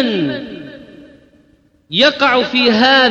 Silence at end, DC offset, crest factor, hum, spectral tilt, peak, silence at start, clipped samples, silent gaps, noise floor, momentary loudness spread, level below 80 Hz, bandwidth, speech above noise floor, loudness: 0 s; under 0.1%; 14 dB; none; -4.5 dB/octave; -2 dBFS; 0 s; under 0.1%; none; -53 dBFS; 21 LU; -54 dBFS; 7.8 kHz; 41 dB; -12 LUFS